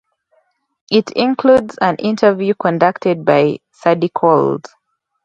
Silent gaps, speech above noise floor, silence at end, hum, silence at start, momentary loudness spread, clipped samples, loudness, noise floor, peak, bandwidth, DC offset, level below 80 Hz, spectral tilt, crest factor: none; 47 dB; 0.65 s; none; 0.9 s; 5 LU; under 0.1%; -15 LUFS; -61 dBFS; 0 dBFS; 8 kHz; under 0.1%; -58 dBFS; -7 dB/octave; 16 dB